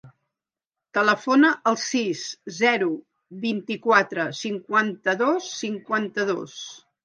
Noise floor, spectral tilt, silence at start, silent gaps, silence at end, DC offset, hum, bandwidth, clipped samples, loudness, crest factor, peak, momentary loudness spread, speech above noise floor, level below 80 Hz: -89 dBFS; -3.5 dB/octave; 0.05 s; 0.66-0.70 s; 0.25 s; under 0.1%; none; 10 kHz; under 0.1%; -23 LUFS; 22 dB; -2 dBFS; 12 LU; 66 dB; -78 dBFS